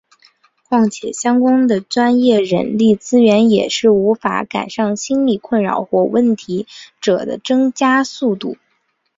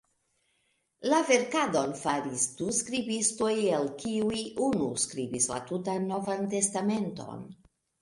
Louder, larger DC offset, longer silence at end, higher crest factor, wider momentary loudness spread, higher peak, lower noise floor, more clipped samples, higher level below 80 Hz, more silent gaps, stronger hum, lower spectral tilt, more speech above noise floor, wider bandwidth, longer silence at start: first, -15 LUFS vs -29 LUFS; neither; first, 0.65 s vs 0.45 s; second, 14 dB vs 20 dB; about the same, 8 LU vs 7 LU; first, -2 dBFS vs -10 dBFS; second, -65 dBFS vs -74 dBFS; neither; first, -58 dBFS vs -66 dBFS; neither; neither; first, -5 dB/octave vs -3.5 dB/octave; first, 51 dB vs 45 dB; second, 7.8 kHz vs 11.5 kHz; second, 0.7 s vs 1 s